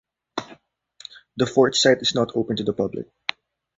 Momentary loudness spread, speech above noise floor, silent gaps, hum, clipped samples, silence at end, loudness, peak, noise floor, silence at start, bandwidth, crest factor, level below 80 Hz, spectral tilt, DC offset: 21 LU; 32 dB; none; none; under 0.1%; 0.75 s; -21 LUFS; -2 dBFS; -53 dBFS; 0.35 s; 8 kHz; 22 dB; -58 dBFS; -4 dB/octave; under 0.1%